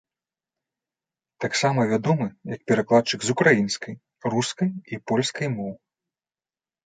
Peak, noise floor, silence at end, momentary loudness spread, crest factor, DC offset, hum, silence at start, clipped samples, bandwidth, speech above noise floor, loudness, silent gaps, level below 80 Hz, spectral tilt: -2 dBFS; under -90 dBFS; 1.1 s; 13 LU; 22 dB; under 0.1%; none; 1.4 s; under 0.1%; 9.6 kHz; over 67 dB; -23 LUFS; none; -66 dBFS; -5 dB/octave